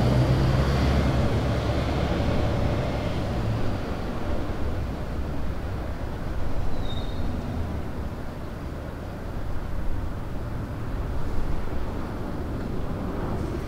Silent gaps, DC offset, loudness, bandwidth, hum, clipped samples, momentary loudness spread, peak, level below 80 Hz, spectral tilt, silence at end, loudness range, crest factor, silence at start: none; under 0.1%; -29 LUFS; 15 kHz; none; under 0.1%; 11 LU; -10 dBFS; -32 dBFS; -7.5 dB/octave; 0 s; 8 LU; 14 dB; 0 s